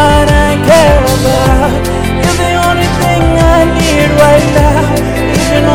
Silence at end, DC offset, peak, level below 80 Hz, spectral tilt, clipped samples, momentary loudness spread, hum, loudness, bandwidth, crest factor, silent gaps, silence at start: 0 s; 3%; 0 dBFS; -16 dBFS; -5.5 dB/octave; 3%; 6 LU; none; -8 LUFS; 19.5 kHz; 8 dB; none; 0 s